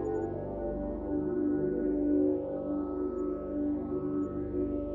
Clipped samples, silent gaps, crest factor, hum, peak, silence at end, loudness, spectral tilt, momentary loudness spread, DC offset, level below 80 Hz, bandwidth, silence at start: under 0.1%; none; 14 dB; 50 Hz at -55 dBFS; -18 dBFS; 0 s; -33 LUFS; -11 dB/octave; 7 LU; under 0.1%; -48 dBFS; 2.5 kHz; 0 s